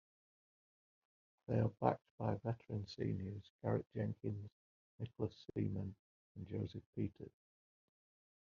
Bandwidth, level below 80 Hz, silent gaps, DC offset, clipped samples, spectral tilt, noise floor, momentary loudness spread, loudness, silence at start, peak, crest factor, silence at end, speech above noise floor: 6.8 kHz; -72 dBFS; 2.11-2.18 s, 3.50-3.59 s, 4.52-4.98 s, 5.99-6.35 s, 6.86-6.93 s; under 0.1%; under 0.1%; -8 dB/octave; under -90 dBFS; 13 LU; -43 LUFS; 1.5 s; -18 dBFS; 26 dB; 1.15 s; over 48 dB